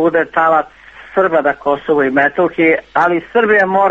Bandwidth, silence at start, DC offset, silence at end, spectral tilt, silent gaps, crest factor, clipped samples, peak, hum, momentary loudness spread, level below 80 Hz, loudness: 7.8 kHz; 0 s; under 0.1%; 0 s; -7 dB/octave; none; 14 dB; under 0.1%; 0 dBFS; none; 5 LU; -52 dBFS; -13 LUFS